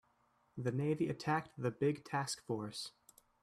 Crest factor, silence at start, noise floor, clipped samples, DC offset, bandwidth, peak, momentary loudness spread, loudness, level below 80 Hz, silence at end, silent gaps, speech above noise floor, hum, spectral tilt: 16 dB; 0.55 s; -75 dBFS; under 0.1%; under 0.1%; 14.5 kHz; -22 dBFS; 9 LU; -39 LUFS; -74 dBFS; 0.55 s; none; 37 dB; none; -5.5 dB/octave